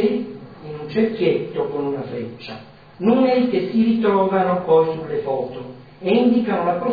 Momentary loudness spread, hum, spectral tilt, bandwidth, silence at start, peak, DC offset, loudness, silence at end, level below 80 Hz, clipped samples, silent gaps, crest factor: 18 LU; none; -9.5 dB/octave; 5 kHz; 0 s; -6 dBFS; 0.2%; -20 LUFS; 0 s; -60 dBFS; under 0.1%; none; 14 dB